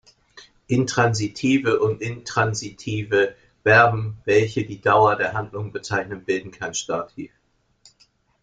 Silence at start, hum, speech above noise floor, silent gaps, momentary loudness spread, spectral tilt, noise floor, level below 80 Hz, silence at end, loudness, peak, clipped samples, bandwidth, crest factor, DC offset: 0.35 s; none; 40 dB; none; 12 LU; -5 dB/octave; -61 dBFS; -56 dBFS; 1.15 s; -21 LUFS; -2 dBFS; under 0.1%; 9.4 kHz; 20 dB; under 0.1%